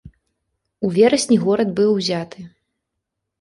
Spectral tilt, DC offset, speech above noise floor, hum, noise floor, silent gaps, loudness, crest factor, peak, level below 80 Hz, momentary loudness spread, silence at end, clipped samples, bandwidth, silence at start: -5 dB/octave; under 0.1%; 62 dB; none; -79 dBFS; none; -18 LUFS; 18 dB; -2 dBFS; -58 dBFS; 11 LU; 0.95 s; under 0.1%; 11.5 kHz; 0.05 s